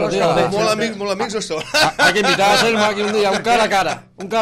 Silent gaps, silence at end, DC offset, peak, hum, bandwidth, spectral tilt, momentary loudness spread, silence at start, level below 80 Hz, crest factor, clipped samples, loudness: none; 0 s; under 0.1%; -4 dBFS; none; 16 kHz; -3 dB/octave; 9 LU; 0 s; -48 dBFS; 12 dB; under 0.1%; -16 LUFS